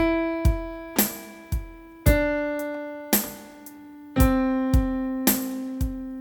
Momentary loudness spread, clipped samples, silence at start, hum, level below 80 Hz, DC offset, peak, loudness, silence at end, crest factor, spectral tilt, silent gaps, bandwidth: 17 LU; under 0.1%; 0 s; none; -30 dBFS; under 0.1%; -4 dBFS; -25 LUFS; 0 s; 20 dB; -5 dB/octave; none; 19 kHz